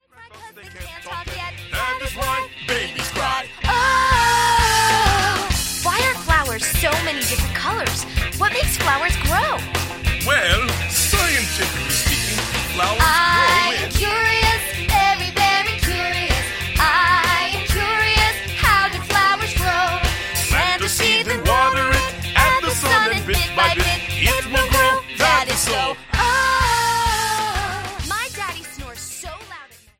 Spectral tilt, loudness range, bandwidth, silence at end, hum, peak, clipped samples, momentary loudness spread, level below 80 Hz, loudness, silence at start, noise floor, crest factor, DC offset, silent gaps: -2.5 dB/octave; 3 LU; 16.5 kHz; 0.35 s; none; -2 dBFS; under 0.1%; 9 LU; -28 dBFS; -18 LUFS; 0.2 s; -42 dBFS; 18 dB; under 0.1%; none